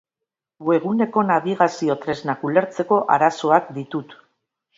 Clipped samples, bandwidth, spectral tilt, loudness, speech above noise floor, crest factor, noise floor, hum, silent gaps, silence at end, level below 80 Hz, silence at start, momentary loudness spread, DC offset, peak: under 0.1%; 7.8 kHz; -6.5 dB/octave; -20 LUFS; 65 dB; 20 dB; -85 dBFS; none; none; 0.65 s; -68 dBFS; 0.6 s; 11 LU; under 0.1%; -2 dBFS